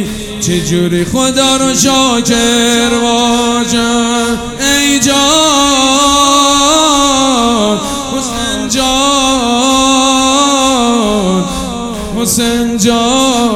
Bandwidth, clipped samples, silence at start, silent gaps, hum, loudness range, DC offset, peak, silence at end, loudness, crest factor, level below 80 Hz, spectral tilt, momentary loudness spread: 18.5 kHz; 0.2%; 0 s; none; none; 2 LU; under 0.1%; 0 dBFS; 0 s; -9 LUFS; 10 dB; -32 dBFS; -2.5 dB/octave; 8 LU